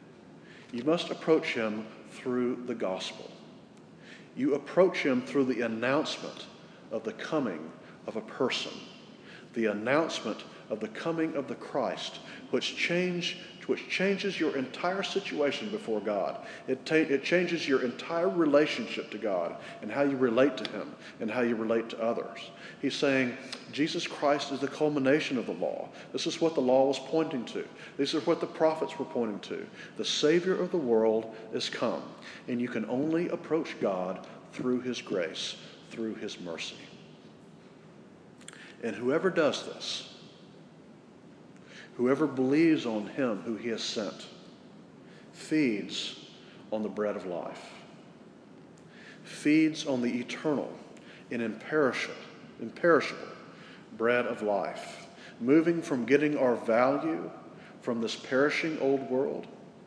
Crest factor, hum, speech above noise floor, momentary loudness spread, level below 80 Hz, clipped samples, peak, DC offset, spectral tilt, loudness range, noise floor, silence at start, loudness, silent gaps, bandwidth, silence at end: 22 dB; none; 23 dB; 19 LU; -80 dBFS; under 0.1%; -10 dBFS; under 0.1%; -5 dB/octave; 6 LU; -53 dBFS; 0 s; -30 LUFS; none; 11 kHz; 0 s